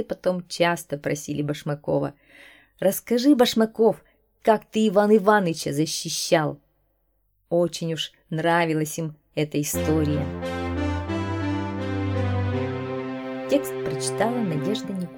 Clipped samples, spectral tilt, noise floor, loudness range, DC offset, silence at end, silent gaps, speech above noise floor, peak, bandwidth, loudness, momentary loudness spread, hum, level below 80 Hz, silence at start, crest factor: under 0.1%; -5 dB/octave; -69 dBFS; 6 LU; under 0.1%; 0 s; none; 46 dB; -4 dBFS; 19 kHz; -24 LUFS; 10 LU; none; -50 dBFS; 0 s; 20 dB